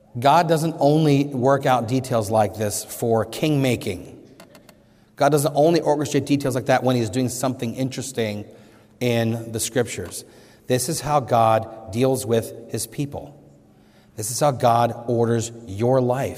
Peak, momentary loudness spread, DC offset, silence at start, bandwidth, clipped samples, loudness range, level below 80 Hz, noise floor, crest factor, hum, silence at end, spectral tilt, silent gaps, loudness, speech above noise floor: -4 dBFS; 11 LU; under 0.1%; 0.15 s; 16 kHz; under 0.1%; 4 LU; -58 dBFS; -52 dBFS; 18 dB; none; 0 s; -5.5 dB/octave; none; -21 LUFS; 32 dB